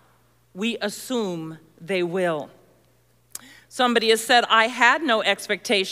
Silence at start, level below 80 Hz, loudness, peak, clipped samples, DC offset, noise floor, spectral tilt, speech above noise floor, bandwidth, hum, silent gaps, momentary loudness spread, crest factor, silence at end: 0.55 s; -72 dBFS; -21 LUFS; -4 dBFS; under 0.1%; under 0.1%; -61 dBFS; -3 dB/octave; 39 dB; 16 kHz; none; none; 23 LU; 20 dB; 0 s